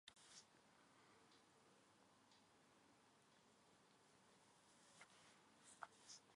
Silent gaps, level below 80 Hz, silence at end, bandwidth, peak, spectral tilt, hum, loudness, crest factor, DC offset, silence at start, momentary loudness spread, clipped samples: none; under -90 dBFS; 0 s; 11 kHz; -36 dBFS; -1.5 dB/octave; none; -65 LUFS; 34 dB; under 0.1%; 0.05 s; 7 LU; under 0.1%